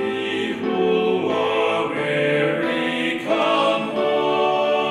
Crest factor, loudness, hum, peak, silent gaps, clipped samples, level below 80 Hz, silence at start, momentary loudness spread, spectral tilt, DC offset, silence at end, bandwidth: 14 dB; -20 LUFS; none; -6 dBFS; none; under 0.1%; -64 dBFS; 0 s; 4 LU; -5.5 dB/octave; under 0.1%; 0 s; 12 kHz